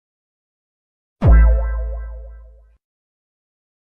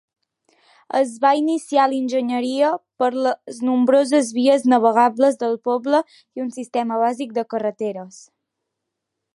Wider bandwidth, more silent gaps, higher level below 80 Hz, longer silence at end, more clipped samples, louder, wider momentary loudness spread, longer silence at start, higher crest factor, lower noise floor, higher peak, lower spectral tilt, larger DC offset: second, 2.8 kHz vs 11.5 kHz; neither; first, -20 dBFS vs -78 dBFS; first, 1.6 s vs 1.25 s; neither; about the same, -17 LUFS vs -19 LUFS; first, 21 LU vs 11 LU; first, 1.2 s vs 0.95 s; about the same, 16 dB vs 18 dB; second, -44 dBFS vs -80 dBFS; about the same, -4 dBFS vs -2 dBFS; first, -10.5 dB/octave vs -4.5 dB/octave; neither